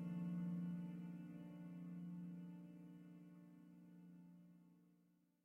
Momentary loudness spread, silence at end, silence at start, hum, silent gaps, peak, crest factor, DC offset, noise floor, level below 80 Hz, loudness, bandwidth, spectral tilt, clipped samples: 18 LU; 0.3 s; 0 s; none; none; -38 dBFS; 14 dB; under 0.1%; -78 dBFS; -88 dBFS; -52 LUFS; 3.1 kHz; -9.5 dB/octave; under 0.1%